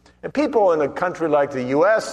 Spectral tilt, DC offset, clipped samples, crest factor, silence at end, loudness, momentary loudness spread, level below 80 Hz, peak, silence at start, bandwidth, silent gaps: -5.5 dB/octave; under 0.1%; under 0.1%; 14 dB; 0 s; -20 LUFS; 6 LU; -58 dBFS; -6 dBFS; 0.25 s; 11.5 kHz; none